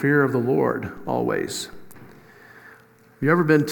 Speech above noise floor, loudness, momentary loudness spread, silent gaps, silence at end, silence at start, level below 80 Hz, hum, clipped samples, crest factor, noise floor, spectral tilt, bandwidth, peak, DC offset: 31 dB; -22 LUFS; 11 LU; none; 0 s; 0 s; -58 dBFS; none; under 0.1%; 20 dB; -52 dBFS; -6 dB/octave; 18 kHz; -4 dBFS; under 0.1%